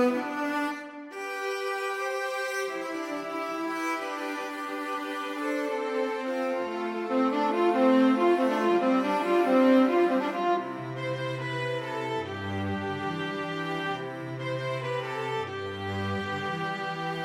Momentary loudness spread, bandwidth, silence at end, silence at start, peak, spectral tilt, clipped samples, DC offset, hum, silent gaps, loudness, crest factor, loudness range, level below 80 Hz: 11 LU; 16 kHz; 0 s; 0 s; -10 dBFS; -6 dB/octave; under 0.1%; under 0.1%; none; none; -28 LUFS; 18 dB; 8 LU; -74 dBFS